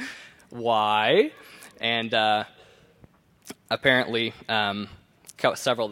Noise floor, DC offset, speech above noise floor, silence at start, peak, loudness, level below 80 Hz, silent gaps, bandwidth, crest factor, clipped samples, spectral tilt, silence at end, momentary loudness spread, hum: -57 dBFS; under 0.1%; 33 dB; 0 s; -6 dBFS; -24 LUFS; -64 dBFS; none; 17 kHz; 22 dB; under 0.1%; -4 dB/octave; 0 s; 20 LU; none